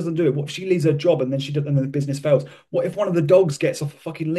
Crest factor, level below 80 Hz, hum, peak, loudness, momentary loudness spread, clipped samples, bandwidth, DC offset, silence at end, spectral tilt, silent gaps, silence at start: 16 dB; -64 dBFS; none; -4 dBFS; -21 LUFS; 10 LU; under 0.1%; 12.5 kHz; under 0.1%; 0 s; -7 dB/octave; none; 0 s